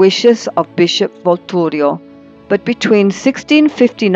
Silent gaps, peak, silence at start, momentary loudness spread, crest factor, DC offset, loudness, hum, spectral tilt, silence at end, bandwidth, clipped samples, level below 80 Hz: none; 0 dBFS; 0 s; 6 LU; 12 dB; under 0.1%; -13 LUFS; none; -5 dB/octave; 0 s; 8 kHz; under 0.1%; -58 dBFS